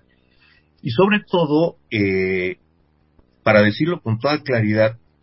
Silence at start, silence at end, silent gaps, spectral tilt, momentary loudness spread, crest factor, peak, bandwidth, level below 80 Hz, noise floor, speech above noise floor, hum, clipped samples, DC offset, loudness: 0.85 s; 0.25 s; none; -10.5 dB/octave; 9 LU; 18 dB; 0 dBFS; 5.8 kHz; -52 dBFS; -60 dBFS; 42 dB; none; under 0.1%; under 0.1%; -19 LUFS